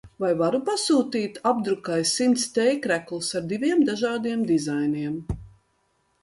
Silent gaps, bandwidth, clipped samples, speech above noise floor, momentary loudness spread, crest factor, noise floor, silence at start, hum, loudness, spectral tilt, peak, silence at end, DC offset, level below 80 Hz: none; 11.5 kHz; under 0.1%; 45 dB; 7 LU; 16 dB; -69 dBFS; 0.05 s; none; -24 LUFS; -4 dB/octave; -8 dBFS; 0.75 s; under 0.1%; -50 dBFS